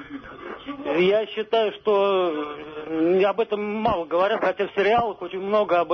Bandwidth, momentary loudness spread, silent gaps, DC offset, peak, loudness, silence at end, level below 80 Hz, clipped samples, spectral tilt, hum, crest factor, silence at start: 6.4 kHz; 14 LU; none; under 0.1%; -10 dBFS; -23 LUFS; 0 s; -56 dBFS; under 0.1%; -7 dB/octave; none; 12 dB; 0 s